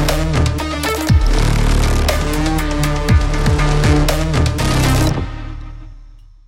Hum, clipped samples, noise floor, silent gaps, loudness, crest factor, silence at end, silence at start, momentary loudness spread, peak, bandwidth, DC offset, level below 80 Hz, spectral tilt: none; under 0.1%; -39 dBFS; none; -16 LUFS; 14 dB; 0.25 s; 0 s; 7 LU; 0 dBFS; 17 kHz; under 0.1%; -18 dBFS; -5.5 dB/octave